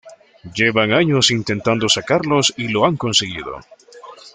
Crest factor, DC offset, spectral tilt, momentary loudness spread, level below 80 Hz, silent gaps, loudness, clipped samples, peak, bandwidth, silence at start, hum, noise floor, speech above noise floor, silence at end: 16 dB; under 0.1%; -3.5 dB/octave; 14 LU; -52 dBFS; none; -16 LUFS; under 0.1%; -2 dBFS; 9.6 kHz; 0.05 s; none; -40 dBFS; 23 dB; 0.05 s